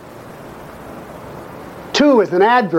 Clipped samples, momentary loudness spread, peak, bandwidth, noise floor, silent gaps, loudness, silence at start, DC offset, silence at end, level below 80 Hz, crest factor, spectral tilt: under 0.1%; 22 LU; -2 dBFS; 16.5 kHz; -35 dBFS; none; -13 LUFS; 0.05 s; under 0.1%; 0 s; -50 dBFS; 14 dB; -5 dB/octave